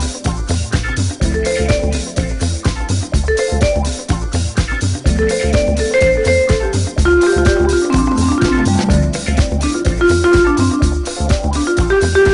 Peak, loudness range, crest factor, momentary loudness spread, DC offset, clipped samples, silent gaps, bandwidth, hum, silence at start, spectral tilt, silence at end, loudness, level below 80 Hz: 0 dBFS; 4 LU; 14 dB; 7 LU; under 0.1%; under 0.1%; none; 11 kHz; none; 0 s; -5.5 dB/octave; 0 s; -15 LUFS; -20 dBFS